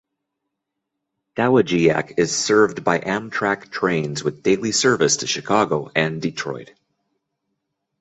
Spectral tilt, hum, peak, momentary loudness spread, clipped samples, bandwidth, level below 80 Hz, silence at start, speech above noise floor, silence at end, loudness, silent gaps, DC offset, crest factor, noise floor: -4 dB/octave; none; -2 dBFS; 9 LU; under 0.1%; 8.2 kHz; -58 dBFS; 1.35 s; 60 dB; 1.35 s; -20 LUFS; none; under 0.1%; 20 dB; -80 dBFS